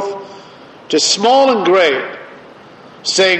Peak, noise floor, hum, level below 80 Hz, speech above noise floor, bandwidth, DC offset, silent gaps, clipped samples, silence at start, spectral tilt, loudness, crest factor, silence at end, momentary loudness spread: 0 dBFS; -39 dBFS; none; -64 dBFS; 27 dB; 8.8 kHz; under 0.1%; none; under 0.1%; 0 s; -2 dB/octave; -13 LUFS; 14 dB; 0 s; 19 LU